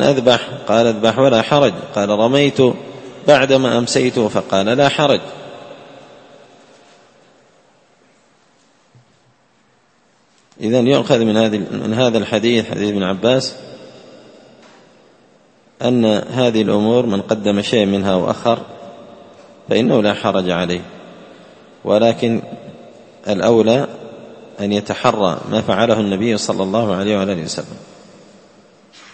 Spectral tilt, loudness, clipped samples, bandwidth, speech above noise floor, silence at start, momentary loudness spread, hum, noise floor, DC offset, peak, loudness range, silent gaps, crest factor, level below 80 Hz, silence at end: -5.5 dB/octave; -16 LUFS; under 0.1%; 8.8 kHz; 41 dB; 0 s; 21 LU; none; -56 dBFS; under 0.1%; 0 dBFS; 6 LU; none; 18 dB; -56 dBFS; 1.3 s